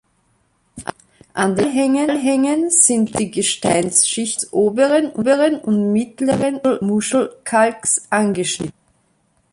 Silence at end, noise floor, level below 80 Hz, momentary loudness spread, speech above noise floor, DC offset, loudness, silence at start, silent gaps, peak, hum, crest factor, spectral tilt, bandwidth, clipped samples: 0.85 s; -62 dBFS; -56 dBFS; 7 LU; 45 dB; under 0.1%; -17 LUFS; 0.75 s; none; 0 dBFS; none; 18 dB; -3.5 dB/octave; 11.5 kHz; under 0.1%